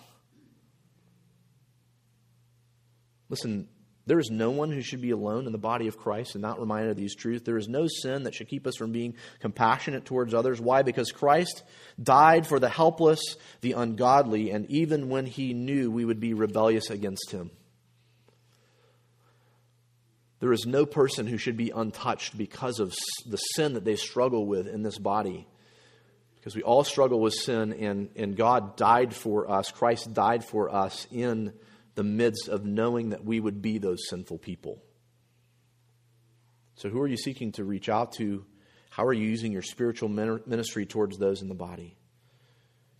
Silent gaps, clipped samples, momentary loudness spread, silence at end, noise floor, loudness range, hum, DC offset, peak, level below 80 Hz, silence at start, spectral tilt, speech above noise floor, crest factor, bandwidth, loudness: none; under 0.1%; 12 LU; 1.1 s; -66 dBFS; 11 LU; none; under 0.1%; -4 dBFS; -68 dBFS; 3.3 s; -5.5 dB/octave; 39 dB; 24 dB; 15 kHz; -28 LUFS